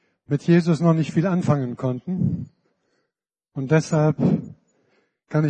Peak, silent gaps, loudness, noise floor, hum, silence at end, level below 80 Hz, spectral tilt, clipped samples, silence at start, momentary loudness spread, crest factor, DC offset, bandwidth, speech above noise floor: -6 dBFS; none; -22 LUFS; -82 dBFS; none; 0 s; -60 dBFS; -8 dB/octave; under 0.1%; 0.3 s; 14 LU; 18 dB; under 0.1%; 8.8 kHz; 62 dB